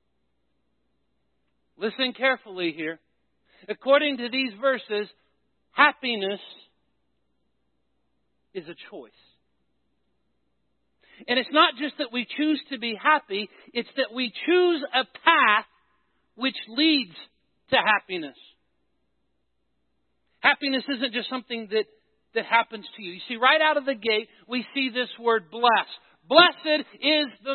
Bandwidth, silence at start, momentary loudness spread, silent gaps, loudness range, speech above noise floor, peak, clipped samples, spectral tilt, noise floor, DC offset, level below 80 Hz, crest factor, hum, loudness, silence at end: 4.5 kHz; 1.8 s; 17 LU; none; 6 LU; 52 dB; -2 dBFS; under 0.1%; -7.5 dB/octave; -77 dBFS; under 0.1%; -78 dBFS; 24 dB; none; -23 LUFS; 0 s